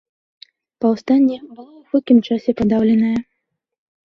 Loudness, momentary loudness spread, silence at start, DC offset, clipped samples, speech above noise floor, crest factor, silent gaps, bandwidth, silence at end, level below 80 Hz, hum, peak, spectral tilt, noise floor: -17 LUFS; 7 LU; 0.8 s; under 0.1%; under 0.1%; 59 dB; 16 dB; none; 6.4 kHz; 0.9 s; -52 dBFS; none; -2 dBFS; -8 dB/octave; -75 dBFS